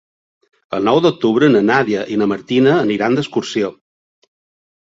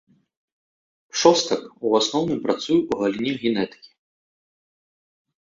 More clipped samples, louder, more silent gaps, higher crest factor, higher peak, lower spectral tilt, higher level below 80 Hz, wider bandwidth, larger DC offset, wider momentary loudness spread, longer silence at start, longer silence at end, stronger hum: neither; first, -15 LUFS vs -22 LUFS; neither; second, 16 dB vs 22 dB; about the same, -2 dBFS vs -2 dBFS; first, -6 dB/octave vs -4 dB/octave; first, -58 dBFS vs -64 dBFS; about the same, 7.8 kHz vs 7.8 kHz; neither; about the same, 8 LU vs 9 LU; second, 0.7 s vs 1.15 s; second, 1.15 s vs 1.9 s; neither